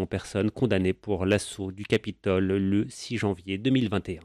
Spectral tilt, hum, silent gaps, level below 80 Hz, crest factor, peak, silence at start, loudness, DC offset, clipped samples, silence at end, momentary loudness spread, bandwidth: -6 dB/octave; none; none; -54 dBFS; 16 dB; -12 dBFS; 0 s; -27 LUFS; under 0.1%; under 0.1%; 0 s; 5 LU; 13.5 kHz